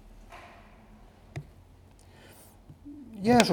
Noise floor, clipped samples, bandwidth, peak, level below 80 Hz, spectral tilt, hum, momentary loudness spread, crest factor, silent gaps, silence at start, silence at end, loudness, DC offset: -55 dBFS; under 0.1%; 19.5 kHz; -4 dBFS; -54 dBFS; -4.5 dB/octave; none; 28 LU; 28 dB; none; 1.35 s; 0 s; -28 LUFS; under 0.1%